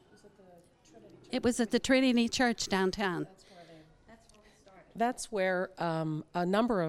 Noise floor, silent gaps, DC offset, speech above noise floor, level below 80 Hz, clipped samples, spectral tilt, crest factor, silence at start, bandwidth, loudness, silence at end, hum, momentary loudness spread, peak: -61 dBFS; none; under 0.1%; 30 dB; -60 dBFS; under 0.1%; -4.5 dB/octave; 18 dB; 0.25 s; 14.5 kHz; -31 LUFS; 0 s; none; 9 LU; -14 dBFS